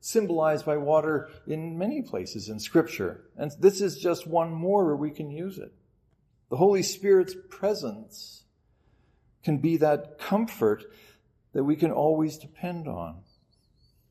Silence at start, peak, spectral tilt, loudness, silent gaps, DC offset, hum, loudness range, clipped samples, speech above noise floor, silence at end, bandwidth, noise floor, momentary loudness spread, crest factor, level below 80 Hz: 0.05 s; -8 dBFS; -6 dB/octave; -27 LUFS; none; under 0.1%; none; 2 LU; under 0.1%; 41 dB; 0.9 s; 15 kHz; -67 dBFS; 14 LU; 20 dB; -66 dBFS